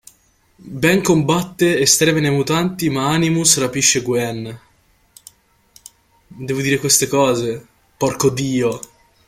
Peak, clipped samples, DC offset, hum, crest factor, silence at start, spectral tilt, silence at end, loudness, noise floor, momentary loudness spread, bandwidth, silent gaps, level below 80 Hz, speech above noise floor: 0 dBFS; under 0.1%; under 0.1%; none; 18 dB; 0.65 s; -3.5 dB/octave; 0.5 s; -16 LUFS; -57 dBFS; 12 LU; 16 kHz; none; -50 dBFS; 40 dB